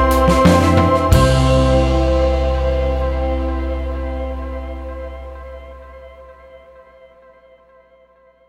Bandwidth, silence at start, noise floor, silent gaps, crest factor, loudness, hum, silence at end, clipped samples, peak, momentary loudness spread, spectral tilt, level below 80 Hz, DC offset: 15.5 kHz; 0 s; -51 dBFS; none; 16 dB; -16 LUFS; 60 Hz at -50 dBFS; 1.9 s; under 0.1%; 0 dBFS; 21 LU; -6.5 dB/octave; -22 dBFS; under 0.1%